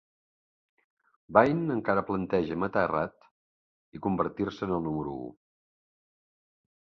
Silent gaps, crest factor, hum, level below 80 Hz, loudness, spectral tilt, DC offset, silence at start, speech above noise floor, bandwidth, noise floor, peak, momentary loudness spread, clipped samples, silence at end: 3.31-3.92 s; 28 dB; none; -58 dBFS; -29 LUFS; -8.5 dB/octave; under 0.1%; 1.3 s; over 62 dB; 7 kHz; under -90 dBFS; -4 dBFS; 13 LU; under 0.1%; 1.5 s